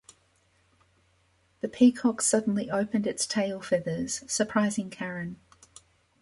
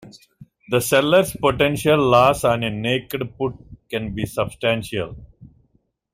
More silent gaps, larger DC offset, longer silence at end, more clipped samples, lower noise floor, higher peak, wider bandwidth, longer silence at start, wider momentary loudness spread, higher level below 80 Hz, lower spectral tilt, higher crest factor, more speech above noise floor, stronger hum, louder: neither; neither; about the same, 0.85 s vs 0.9 s; neither; about the same, -67 dBFS vs -64 dBFS; second, -10 dBFS vs -2 dBFS; second, 11.5 kHz vs 16 kHz; first, 1.65 s vs 0 s; about the same, 15 LU vs 13 LU; second, -66 dBFS vs -46 dBFS; about the same, -4 dB/octave vs -5 dB/octave; about the same, 20 dB vs 20 dB; second, 40 dB vs 45 dB; neither; second, -27 LUFS vs -20 LUFS